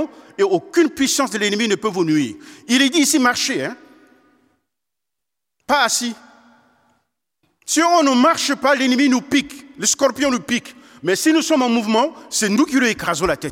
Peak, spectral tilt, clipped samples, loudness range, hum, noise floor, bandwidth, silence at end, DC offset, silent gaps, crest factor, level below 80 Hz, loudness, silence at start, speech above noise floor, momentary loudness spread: -2 dBFS; -2.5 dB/octave; under 0.1%; 8 LU; none; -84 dBFS; 16.5 kHz; 0 s; under 0.1%; none; 16 dB; -54 dBFS; -17 LUFS; 0 s; 66 dB; 9 LU